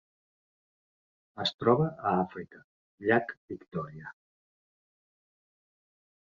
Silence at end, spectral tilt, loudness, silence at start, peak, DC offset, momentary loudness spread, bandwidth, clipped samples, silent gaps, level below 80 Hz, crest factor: 2.2 s; -7 dB/octave; -30 LUFS; 1.35 s; -10 dBFS; under 0.1%; 21 LU; 7.6 kHz; under 0.1%; 1.54-1.59 s, 2.64-2.98 s, 3.37-3.48 s; -68 dBFS; 24 dB